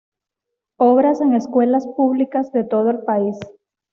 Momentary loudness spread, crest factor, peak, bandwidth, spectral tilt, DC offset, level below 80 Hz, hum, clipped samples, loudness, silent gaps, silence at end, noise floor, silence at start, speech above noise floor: 6 LU; 14 dB; -4 dBFS; 7 kHz; -8 dB/octave; under 0.1%; -66 dBFS; none; under 0.1%; -17 LUFS; none; 0.45 s; -82 dBFS; 0.8 s; 65 dB